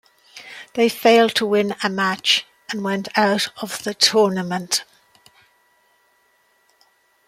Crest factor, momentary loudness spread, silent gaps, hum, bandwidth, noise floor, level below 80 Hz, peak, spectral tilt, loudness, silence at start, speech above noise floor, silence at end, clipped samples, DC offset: 20 dB; 14 LU; none; none; 16 kHz; -61 dBFS; -68 dBFS; -2 dBFS; -3 dB/octave; -19 LUFS; 0.35 s; 43 dB; 2.45 s; under 0.1%; under 0.1%